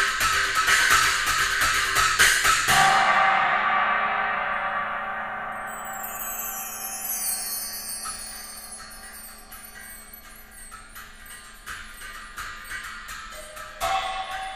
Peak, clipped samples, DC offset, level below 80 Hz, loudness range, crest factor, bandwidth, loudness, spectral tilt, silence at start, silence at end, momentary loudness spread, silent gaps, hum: -4 dBFS; under 0.1%; 0.1%; -46 dBFS; 20 LU; 22 dB; 15.5 kHz; -22 LUFS; 0 dB/octave; 0 s; 0 s; 23 LU; none; none